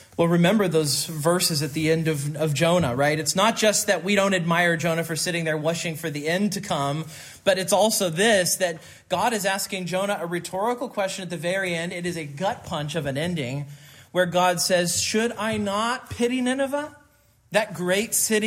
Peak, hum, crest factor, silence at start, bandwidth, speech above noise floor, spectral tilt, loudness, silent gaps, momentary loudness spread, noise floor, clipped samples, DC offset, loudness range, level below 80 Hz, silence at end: -6 dBFS; none; 18 dB; 0 s; 16 kHz; 35 dB; -4 dB/octave; -23 LUFS; none; 9 LU; -59 dBFS; under 0.1%; under 0.1%; 6 LU; -62 dBFS; 0 s